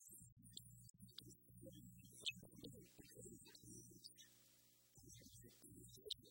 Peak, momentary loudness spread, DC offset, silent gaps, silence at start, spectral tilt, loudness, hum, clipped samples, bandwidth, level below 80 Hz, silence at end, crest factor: -30 dBFS; 14 LU; under 0.1%; 0.32-0.37 s, 0.90-0.94 s; 0 s; -2.5 dB/octave; -58 LUFS; 60 Hz at -70 dBFS; under 0.1%; 16.5 kHz; -78 dBFS; 0 s; 32 dB